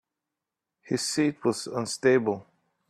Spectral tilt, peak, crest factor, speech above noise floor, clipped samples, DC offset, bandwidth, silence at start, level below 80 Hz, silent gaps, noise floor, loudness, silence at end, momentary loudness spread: -4.5 dB/octave; -8 dBFS; 20 dB; 61 dB; under 0.1%; under 0.1%; 13.5 kHz; 0.85 s; -72 dBFS; none; -87 dBFS; -27 LUFS; 0.45 s; 9 LU